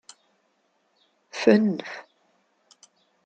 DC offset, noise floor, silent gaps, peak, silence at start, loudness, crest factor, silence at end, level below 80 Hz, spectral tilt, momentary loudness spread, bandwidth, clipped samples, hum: under 0.1%; -70 dBFS; none; -4 dBFS; 1.35 s; -22 LUFS; 24 dB; 1.25 s; -74 dBFS; -6 dB/octave; 20 LU; 8.8 kHz; under 0.1%; none